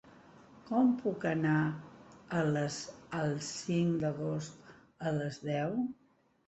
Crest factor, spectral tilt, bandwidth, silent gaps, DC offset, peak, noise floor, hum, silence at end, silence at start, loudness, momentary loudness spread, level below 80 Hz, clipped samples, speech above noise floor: 16 dB; -6.5 dB/octave; 8.2 kHz; none; under 0.1%; -18 dBFS; -57 dBFS; none; 0.55 s; 0.05 s; -34 LUFS; 10 LU; -70 dBFS; under 0.1%; 25 dB